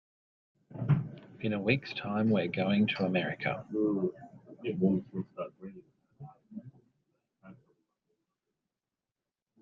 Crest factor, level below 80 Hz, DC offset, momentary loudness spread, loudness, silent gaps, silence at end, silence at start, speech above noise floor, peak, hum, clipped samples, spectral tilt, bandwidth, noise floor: 22 dB; -68 dBFS; under 0.1%; 21 LU; -32 LUFS; none; 2.1 s; 0.7 s; over 59 dB; -14 dBFS; none; under 0.1%; -9 dB/octave; 6 kHz; under -90 dBFS